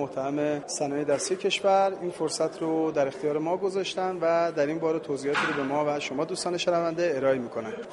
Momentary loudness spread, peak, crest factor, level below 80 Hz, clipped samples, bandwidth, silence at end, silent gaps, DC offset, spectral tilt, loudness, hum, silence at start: 5 LU; -12 dBFS; 16 dB; -70 dBFS; under 0.1%; 11.5 kHz; 0 s; none; under 0.1%; -4 dB/octave; -27 LUFS; none; 0 s